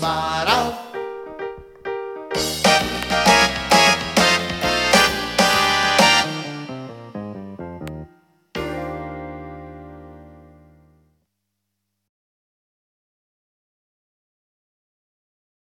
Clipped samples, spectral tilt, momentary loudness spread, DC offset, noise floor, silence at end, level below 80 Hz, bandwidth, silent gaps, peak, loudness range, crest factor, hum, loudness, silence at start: under 0.1%; -2.5 dB/octave; 20 LU; under 0.1%; -77 dBFS; 5.4 s; -44 dBFS; 17 kHz; none; 0 dBFS; 18 LU; 22 dB; 50 Hz at -50 dBFS; -17 LUFS; 0 s